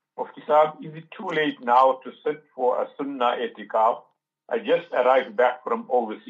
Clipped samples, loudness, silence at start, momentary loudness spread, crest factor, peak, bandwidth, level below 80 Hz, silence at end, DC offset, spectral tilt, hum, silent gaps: under 0.1%; -23 LUFS; 0.2 s; 12 LU; 18 dB; -6 dBFS; 7.4 kHz; -84 dBFS; 0.1 s; under 0.1%; -6 dB/octave; none; none